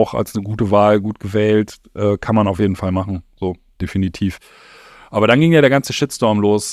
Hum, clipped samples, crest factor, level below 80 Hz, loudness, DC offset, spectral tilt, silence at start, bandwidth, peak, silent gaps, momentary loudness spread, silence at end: none; under 0.1%; 16 dB; -44 dBFS; -17 LUFS; under 0.1%; -6 dB/octave; 0 s; 14.5 kHz; 0 dBFS; none; 13 LU; 0 s